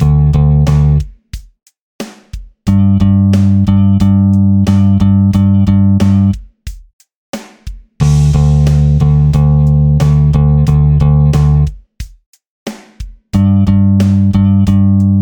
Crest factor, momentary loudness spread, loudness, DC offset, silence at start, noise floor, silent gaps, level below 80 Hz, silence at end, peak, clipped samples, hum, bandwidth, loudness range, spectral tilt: 10 dB; 19 LU; -10 LUFS; under 0.1%; 0 s; -29 dBFS; 1.81-1.99 s, 6.93-6.99 s, 7.15-7.33 s, 12.26-12.33 s, 12.47-12.66 s; -20 dBFS; 0 s; 0 dBFS; under 0.1%; none; 9.2 kHz; 4 LU; -9 dB/octave